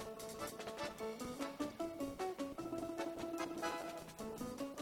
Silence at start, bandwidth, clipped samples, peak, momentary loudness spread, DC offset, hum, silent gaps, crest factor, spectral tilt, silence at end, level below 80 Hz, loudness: 0 s; 18 kHz; under 0.1%; -28 dBFS; 4 LU; under 0.1%; none; none; 16 dB; -4 dB/octave; 0 s; -68 dBFS; -45 LUFS